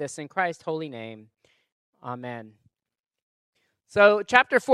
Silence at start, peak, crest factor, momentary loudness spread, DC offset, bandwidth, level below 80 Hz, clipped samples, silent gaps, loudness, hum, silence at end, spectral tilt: 0 s; 0 dBFS; 26 dB; 21 LU; under 0.1%; 12.5 kHz; -70 dBFS; under 0.1%; 1.72-1.93 s, 3.00-3.04 s, 3.22-3.53 s; -22 LUFS; none; 0 s; -4 dB/octave